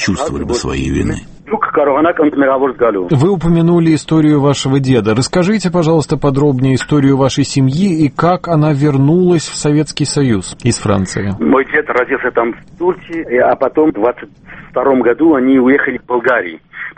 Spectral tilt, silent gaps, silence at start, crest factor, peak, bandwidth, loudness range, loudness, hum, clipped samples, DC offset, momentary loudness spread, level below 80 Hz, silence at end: -6 dB/octave; none; 0 s; 12 dB; 0 dBFS; 8.8 kHz; 3 LU; -13 LUFS; none; under 0.1%; under 0.1%; 7 LU; -36 dBFS; 0.05 s